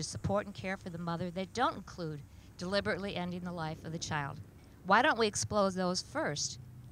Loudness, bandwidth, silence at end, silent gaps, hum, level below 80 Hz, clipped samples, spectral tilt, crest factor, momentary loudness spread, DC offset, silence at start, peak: -34 LUFS; 16 kHz; 0 s; none; none; -58 dBFS; under 0.1%; -4 dB/octave; 22 dB; 14 LU; under 0.1%; 0 s; -12 dBFS